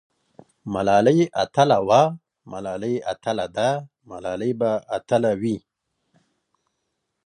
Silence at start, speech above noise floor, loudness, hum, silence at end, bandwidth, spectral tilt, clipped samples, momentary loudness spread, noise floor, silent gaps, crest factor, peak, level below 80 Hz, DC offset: 0.65 s; 56 dB; -22 LUFS; none; 1.7 s; 10 kHz; -6 dB/octave; under 0.1%; 16 LU; -77 dBFS; none; 20 dB; -2 dBFS; -58 dBFS; under 0.1%